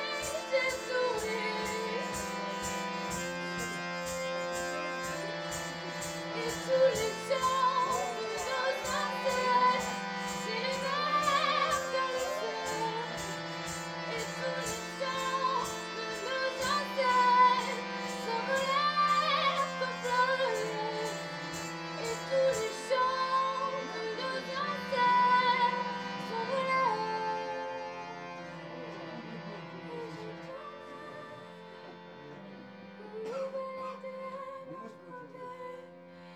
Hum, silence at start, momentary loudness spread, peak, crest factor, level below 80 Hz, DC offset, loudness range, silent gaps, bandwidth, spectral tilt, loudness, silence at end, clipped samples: none; 0 s; 17 LU; -14 dBFS; 18 dB; -66 dBFS; under 0.1%; 13 LU; none; over 20 kHz; -3 dB/octave; -32 LUFS; 0 s; under 0.1%